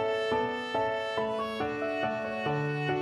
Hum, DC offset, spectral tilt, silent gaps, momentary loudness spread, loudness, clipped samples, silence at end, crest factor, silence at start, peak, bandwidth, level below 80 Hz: none; under 0.1%; -6 dB/octave; none; 3 LU; -31 LUFS; under 0.1%; 0 s; 14 dB; 0 s; -16 dBFS; 12.5 kHz; -62 dBFS